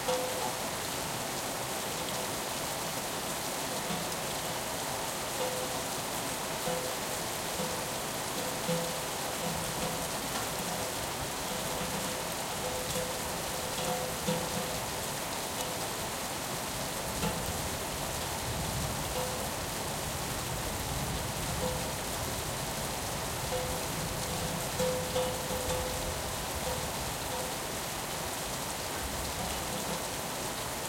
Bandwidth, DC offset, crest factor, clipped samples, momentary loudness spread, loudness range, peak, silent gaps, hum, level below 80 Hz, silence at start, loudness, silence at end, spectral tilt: 16.5 kHz; under 0.1%; 18 dB; under 0.1%; 2 LU; 1 LU; -16 dBFS; none; none; -50 dBFS; 0 s; -33 LUFS; 0 s; -3 dB/octave